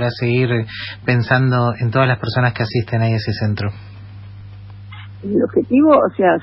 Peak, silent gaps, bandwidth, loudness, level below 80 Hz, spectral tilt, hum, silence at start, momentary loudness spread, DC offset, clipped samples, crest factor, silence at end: -2 dBFS; none; 5.8 kHz; -17 LUFS; -48 dBFS; -10 dB/octave; 50 Hz at -35 dBFS; 0 s; 23 LU; under 0.1%; under 0.1%; 16 dB; 0 s